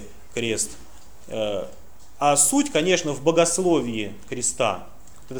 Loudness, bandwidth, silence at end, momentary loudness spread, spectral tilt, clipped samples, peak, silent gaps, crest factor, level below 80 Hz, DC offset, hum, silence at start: -22 LUFS; over 20 kHz; 0 s; 15 LU; -3 dB/octave; under 0.1%; -4 dBFS; none; 20 dB; -52 dBFS; 1%; none; 0 s